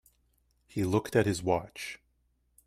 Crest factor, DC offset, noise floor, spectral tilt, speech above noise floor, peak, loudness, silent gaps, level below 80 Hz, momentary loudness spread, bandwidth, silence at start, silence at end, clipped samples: 22 dB; under 0.1%; -73 dBFS; -6 dB/octave; 43 dB; -12 dBFS; -31 LUFS; none; -60 dBFS; 14 LU; 15.5 kHz; 0.75 s; 0.7 s; under 0.1%